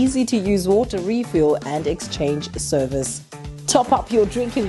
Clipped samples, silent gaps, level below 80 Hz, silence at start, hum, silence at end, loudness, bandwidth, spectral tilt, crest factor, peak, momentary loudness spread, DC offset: under 0.1%; none; -40 dBFS; 0 s; none; 0 s; -20 LUFS; 12.5 kHz; -5 dB/octave; 16 dB; -4 dBFS; 7 LU; under 0.1%